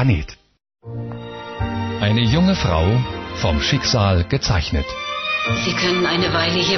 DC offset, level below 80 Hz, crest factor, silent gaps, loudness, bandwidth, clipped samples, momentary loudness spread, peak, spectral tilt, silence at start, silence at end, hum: under 0.1%; -32 dBFS; 14 dB; none; -19 LUFS; 6.4 kHz; under 0.1%; 14 LU; -4 dBFS; -4 dB/octave; 0 s; 0 s; none